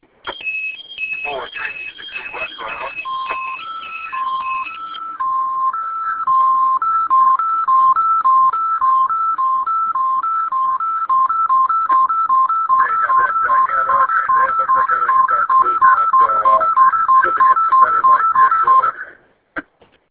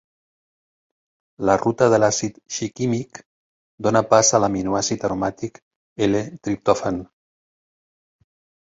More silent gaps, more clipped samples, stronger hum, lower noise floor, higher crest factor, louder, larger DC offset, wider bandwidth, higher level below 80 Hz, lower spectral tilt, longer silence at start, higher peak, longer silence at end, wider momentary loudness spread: second, none vs 3.26-3.78 s, 5.62-5.96 s; neither; neither; second, -49 dBFS vs under -90 dBFS; about the same, 16 dB vs 20 dB; first, -15 LUFS vs -20 LUFS; neither; second, 4 kHz vs 7.8 kHz; about the same, -58 dBFS vs -54 dBFS; about the same, -5 dB/octave vs -4.5 dB/octave; second, 0.25 s vs 1.4 s; about the same, 0 dBFS vs -2 dBFS; second, 0.5 s vs 1.6 s; about the same, 13 LU vs 12 LU